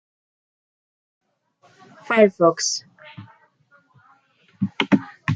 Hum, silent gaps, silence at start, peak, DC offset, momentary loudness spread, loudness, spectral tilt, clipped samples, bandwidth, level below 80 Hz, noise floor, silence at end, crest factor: none; none; 2.1 s; -2 dBFS; under 0.1%; 16 LU; -20 LUFS; -4.5 dB/octave; under 0.1%; 9.4 kHz; -68 dBFS; -60 dBFS; 0 s; 22 dB